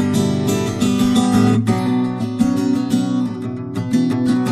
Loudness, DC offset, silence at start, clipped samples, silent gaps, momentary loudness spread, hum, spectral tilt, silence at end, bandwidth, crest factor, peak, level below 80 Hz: -18 LUFS; under 0.1%; 0 s; under 0.1%; none; 7 LU; none; -6.5 dB/octave; 0 s; 13.5 kHz; 14 dB; -2 dBFS; -48 dBFS